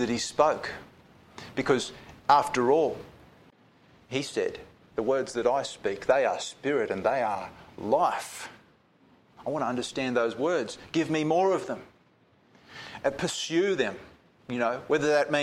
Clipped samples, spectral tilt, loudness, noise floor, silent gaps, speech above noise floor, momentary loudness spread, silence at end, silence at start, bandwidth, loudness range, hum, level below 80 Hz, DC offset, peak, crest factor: under 0.1%; -4.5 dB/octave; -28 LUFS; -63 dBFS; none; 36 dB; 15 LU; 0 s; 0 s; 15 kHz; 3 LU; none; -64 dBFS; under 0.1%; -6 dBFS; 22 dB